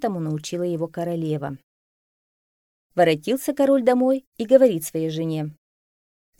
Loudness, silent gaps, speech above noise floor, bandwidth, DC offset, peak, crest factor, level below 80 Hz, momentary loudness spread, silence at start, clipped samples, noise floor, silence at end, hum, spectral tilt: -22 LUFS; 1.63-2.90 s, 4.27-4.32 s; over 69 dB; 17 kHz; under 0.1%; -2 dBFS; 20 dB; -66 dBFS; 13 LU; 0 s; under 0.1%; under -90 dBFS; 0.9 s; none; -6 dB/octave